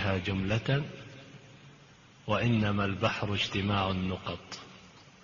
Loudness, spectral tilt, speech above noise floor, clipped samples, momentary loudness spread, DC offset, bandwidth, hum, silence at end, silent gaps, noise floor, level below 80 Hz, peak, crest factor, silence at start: -31 LUFS; -6 dB/octave; 26 dB; under 0.1%; 21 LU; under 0.1%; 7.2 kHz; none; 0.2 s; none; -56 dBFS; -56 dBFS; -12 dBFS; 20 dB; 0 s